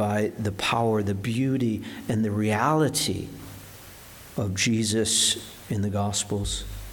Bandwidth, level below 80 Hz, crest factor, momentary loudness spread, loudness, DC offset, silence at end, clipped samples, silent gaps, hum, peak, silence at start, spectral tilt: 19 kHz; -46 dBFS; 18 dB; 18 LU; -25 LUFS; under 0.1%; 0 s; under 0.1%; none; none; -8 dBFS; 0 s; -4 dB/octave